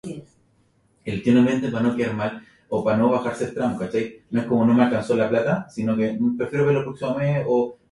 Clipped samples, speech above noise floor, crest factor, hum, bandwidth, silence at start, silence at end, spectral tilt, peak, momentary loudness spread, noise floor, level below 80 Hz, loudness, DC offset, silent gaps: under 0.1%; 41 dB; 16 dB; none; 11 kHz; 0.05 s; 0.2 s; -7.5 dB/octave; -6 dBFS; 10 LU; -62 dBFS; -56 dBFS; -22 LUFS; under 0.1%; none